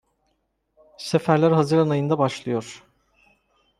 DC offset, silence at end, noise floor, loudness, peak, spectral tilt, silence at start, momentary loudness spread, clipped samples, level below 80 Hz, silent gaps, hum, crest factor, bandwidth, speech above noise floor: under 0.1%; 1 s; -72 dBFS; -21 LUFS; -4 dBFS; -7 dB/octave; 1 s; 12 LU; under 0.1%; -64 dBFS; none; none; 20 dB; 12.5 kHz; 51 dB